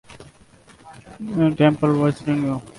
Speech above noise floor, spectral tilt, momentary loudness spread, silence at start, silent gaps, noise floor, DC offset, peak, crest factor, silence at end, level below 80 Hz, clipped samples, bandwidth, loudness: 31 dB; -8 dB/octave; 9 LU; 0.1 s; none; -50 dBFS; under 0.1%; -4 dBFS; 18 dB; 0.05 s; -54 dBFS; under 0.1%; 11.5 kHz; -20 LUFS